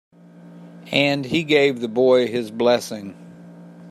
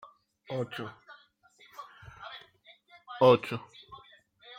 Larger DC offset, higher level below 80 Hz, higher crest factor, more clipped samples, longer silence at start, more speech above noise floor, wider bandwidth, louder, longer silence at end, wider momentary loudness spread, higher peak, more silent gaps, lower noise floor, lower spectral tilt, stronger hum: neither; first, -64 dBFS vs -72 dBFS; about the same, 20 dB vs 24 dB; neither; about the same, 0.45 s vs 0.5 s; second, 25 dB vs 35 dB; about the same, 15 kHz vs 15.5 kHz; first, -19 LUFS vs -28 LUFS; about the same, 0 s vs 0 s; second, 12 LU vs 27 LU; first, -2 dBFS vs -8 dBFS; neither; second, -44 dBFS vs -62 dBFS; second, -5 dB/octave vs -7 dB/octave; neither